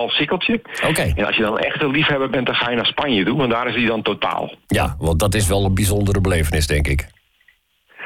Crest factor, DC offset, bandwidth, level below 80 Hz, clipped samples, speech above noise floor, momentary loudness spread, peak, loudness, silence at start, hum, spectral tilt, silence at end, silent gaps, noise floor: 10 dB; under 0.1%; 17 kHz; -32 dBFS; under 0.1%; 40 dB; 3 LU; -8 dBFS; -18 LUFS; 0 s; none; -4.5 dB/octave; 0 s; none; -58 dBFS